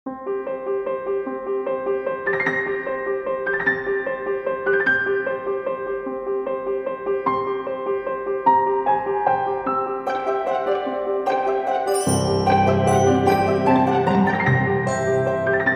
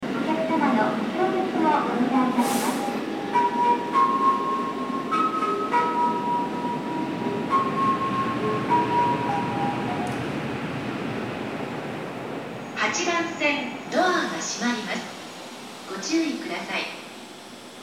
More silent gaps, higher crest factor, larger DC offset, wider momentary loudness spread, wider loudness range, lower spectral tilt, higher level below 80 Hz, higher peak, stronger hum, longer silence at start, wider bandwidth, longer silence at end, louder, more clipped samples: neither; about the same, 16 dB vs 16 dB; neither; second, 8 LU vs 11 LU; about the same, 6 LU vs 6 LU; first, -6 dB/octave vs -4.5 dB/octave; first, -52 dBFS vs -64 dBFS; first, -4 dBFS vs -8 dBFS; neither; about the same, 0.05 s vs 0 s; about the same, 15.5 kHz vs 17 kHz; about the same, 0 s vs 0 s; first, -21 LUFS vs -25 LUFS; neither